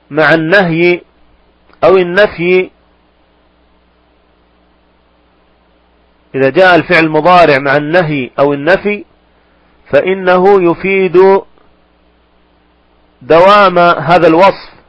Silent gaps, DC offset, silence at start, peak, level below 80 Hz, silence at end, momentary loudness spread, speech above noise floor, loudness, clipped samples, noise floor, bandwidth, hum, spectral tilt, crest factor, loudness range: none; under 0.1%; 0.1 s; 0 dBFS; -44 dBFS; 0.2 s; 7 LU; 42 dB; -8 LUFS; 0.8%; -50 dBFS; 8.6 kHz; none; -7 dB/octave; 10 dB; 6 LU